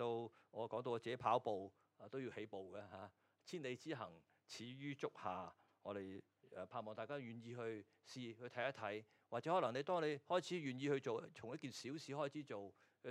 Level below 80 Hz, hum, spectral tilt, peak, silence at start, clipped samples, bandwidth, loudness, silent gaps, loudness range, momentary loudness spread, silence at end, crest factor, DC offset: under -90 dBFS; none; -5.5 dB/octave; -24 dBFS; 0 s; under 0.1%; 13.5 kHz; -47 LUFS; none; 8 LU; 16 LU; 0 s; 24 dB; under 0.1%